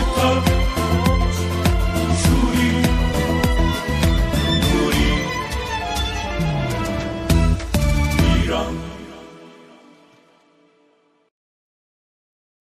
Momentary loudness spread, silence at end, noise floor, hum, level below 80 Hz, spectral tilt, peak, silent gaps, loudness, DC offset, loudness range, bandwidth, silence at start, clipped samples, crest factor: 7 LU; 3.2 s; -60 dBFS; none; -24 dBFS; -5.5 dB/octave; -4 dBFS; none; -19 LUFS; under 0.1%; 5 LU; 15.5 kHz; 0 s; under 0.1%; 16 dB